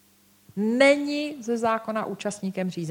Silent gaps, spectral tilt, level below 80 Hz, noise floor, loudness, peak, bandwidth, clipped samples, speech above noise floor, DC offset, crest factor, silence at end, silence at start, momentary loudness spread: none; -5 dB/octave; -72 dBFS; -57 dBFS; -25 LUFS; -4 dBFS; 16.5 kHz; under 0.1%; 32 dB; under 0.1%; 20 dB; 0 s; 0.55 s; 11 LU